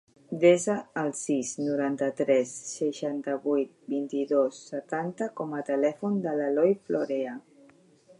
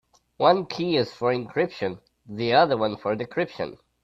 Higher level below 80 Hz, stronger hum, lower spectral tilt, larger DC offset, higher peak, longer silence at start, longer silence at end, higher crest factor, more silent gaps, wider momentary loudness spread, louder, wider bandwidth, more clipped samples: second, -80 dBFS vs -64 dBFS; neither; about the same, -5.5 dB/octave vs -6.5 dB/octave; neither; second, -8 dBFS vs -4 dBFS; about the same, 0.3 s vs 0.4 s; first, 0.8 s vs 0.3 s; about the same, 20 dB vs 20 dB; neither; second, 9 LU vs 13 LU; second, -28 LUFS vs -24 LUFS; first, 11.5 kHz vs 7.6 kHz; neither